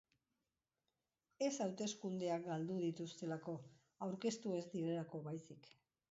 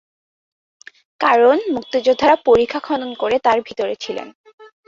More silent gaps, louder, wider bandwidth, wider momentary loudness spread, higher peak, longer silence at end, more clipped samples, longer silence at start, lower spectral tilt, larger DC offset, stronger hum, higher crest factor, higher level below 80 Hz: second, none vs 4.35-4.44 s, 4.53-4.58 s; second, -44 LUFS vs -17 LUFS; about the same, 7.6 kHz vs 7.6 kHz; about the same, 9 LU vs 11 LU; second, -28 dBFS vs -2 dBFS; first, 0.4 s vs 0.25 s; neither; first, 1.4 s vs 1.2 s; first, -6 dB/octave vs -4.5 dB/octave; neither; neither; about the same, 18 dB vs 16 dB; second, -88 dBFS vs -54 dBFS